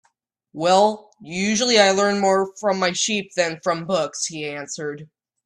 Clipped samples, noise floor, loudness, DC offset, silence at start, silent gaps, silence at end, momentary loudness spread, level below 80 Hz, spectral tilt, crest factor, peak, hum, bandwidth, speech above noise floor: under 0.1%; -68 dBFS; -20 LUFS; under 0.1%; 0.55 s; none; 0.4 s; 15 LU; -64 dBFS; -3 dB/octave; 20 dB; 0 dBFS; none; 11.5 kHz; 47 dB